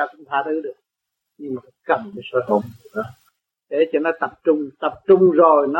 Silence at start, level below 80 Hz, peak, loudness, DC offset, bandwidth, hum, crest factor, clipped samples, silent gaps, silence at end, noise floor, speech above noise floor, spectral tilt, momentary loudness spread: 0 s; -66 dBFS; -2 dBFS; -19 LUFS; under 0.1%; 4.3 kHz; none; 18 dB; under 0.1%; none; 0 s; -81 dBFS; 62 dB; -8.5 dB/octave; 17 LU